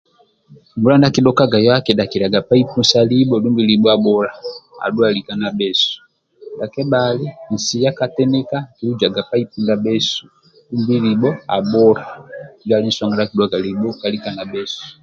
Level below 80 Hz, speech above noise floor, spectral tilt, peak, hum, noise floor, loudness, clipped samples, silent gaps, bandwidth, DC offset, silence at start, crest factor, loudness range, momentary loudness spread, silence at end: -54 dBFS; 24 dB; -5.5 dB/octave; 0 dBFS; none; -40 dBFS; -16 LUFS; under 0.1%; none; 7.8 kHz; under 0.1%; 0.5 s; 16 dB; 5 LU; 12 LU; 0.1 s